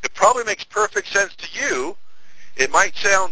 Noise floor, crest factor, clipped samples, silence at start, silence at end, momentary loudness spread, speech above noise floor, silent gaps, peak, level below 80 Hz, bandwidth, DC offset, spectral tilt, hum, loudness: -45 dBFS; 20 dB; under 0.1%; 0 s; 0 s; 8 LU; 25 dB; none; 0 dBFS; -56 dBFS; 8 kHz; under 0.1%; -1 dB/octave; none; -19 LUFS